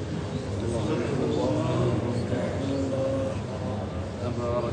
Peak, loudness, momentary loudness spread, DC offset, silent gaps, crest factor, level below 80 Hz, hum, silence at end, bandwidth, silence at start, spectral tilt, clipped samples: -14 dBFS; -28 LUFS; 6 LU; under 0.1%; none; 14 dB; -44 dBFS; none; 0 s; 9.6 kHz; 0 s; -7 dB/octave; under 0.1%